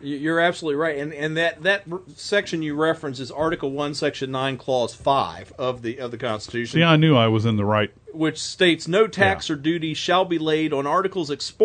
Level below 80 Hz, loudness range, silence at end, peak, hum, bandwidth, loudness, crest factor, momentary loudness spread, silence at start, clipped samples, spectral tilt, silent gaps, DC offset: -56 dBFS; 5 LU; 0 s; -4 dBFS; none; 9.4 kHz; -22 LUFS; 18 dB; 10 LU; 0 s; under 0.1%; -5.5 dB/octave; none; under 0.1%